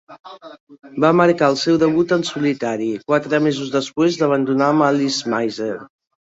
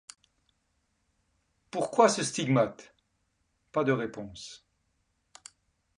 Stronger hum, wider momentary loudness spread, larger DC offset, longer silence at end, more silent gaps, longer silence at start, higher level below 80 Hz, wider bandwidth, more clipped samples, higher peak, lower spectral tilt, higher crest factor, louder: neither; second, 11 LU vs 18 LU; neither; second, 0.45 s vs 1.45 s; first, 0.20-0.24 s, 0.60-0.67 s vs none; second, 0.1 s vs 1.75 s; first, -60 dBFS vs -68 dBFS; second, 8 kHz vs 11.5 kHz; neither; first, -2 dBFS vs -8 dBFS; about the same, -5.5 dB/octave vs -4.5 dB/octave; second, 16 dB vs 24 dB; first, -18 LUFS vs -28 LUFS